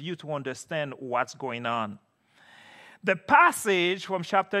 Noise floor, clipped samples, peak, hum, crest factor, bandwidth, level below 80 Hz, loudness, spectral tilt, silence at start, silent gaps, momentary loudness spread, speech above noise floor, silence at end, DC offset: -59 dBFS; under 0.1%; -6 dBFS; none; 22 dB; 15 kHz; -76 dBFS; -26 LUFS; -4 dB/octave; 0 s; none; 14 LU; 32 dB; 0 s; under 0.1%